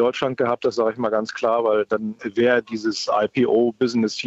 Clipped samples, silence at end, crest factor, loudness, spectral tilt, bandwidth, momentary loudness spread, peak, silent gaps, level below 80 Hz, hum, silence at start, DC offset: under 0.1%; 0 s; 12 dB; -21 LUFS; -5 dB/octave; 8 kHz; 5 LU; -8 dBFS; none; -64 dBFS; none; 0 s; under 0.1%